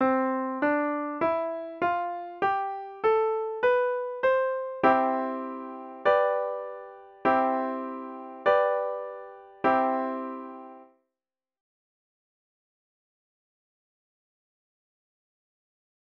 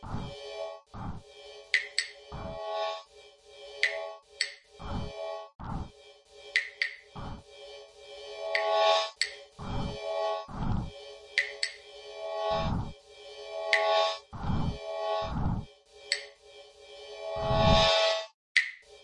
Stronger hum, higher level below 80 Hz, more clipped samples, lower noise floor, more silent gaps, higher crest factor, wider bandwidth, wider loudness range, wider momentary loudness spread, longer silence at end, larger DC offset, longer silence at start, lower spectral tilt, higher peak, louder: neither; second, -70 dBFS vs -46 dBFS; neither; first, under -90 dBFS vs -55 dBFS; second, none vs 5.55-5.59 s, 18.34-18.55 s; second, 20 dB vs 28 dB; second, 6 kHz vs 11 kHz; about the same, 6 LU vs 7 LU; second, 16 LU vs 22 LU; first, 5.2 s vs 0 s; neither; about the same, 0 s vs 0 s; first, -7 dB/octave vs -4 dB/octave; second, -8 dBFS vs -4 dBFS; first, -27 LUFS vs -31 LUFS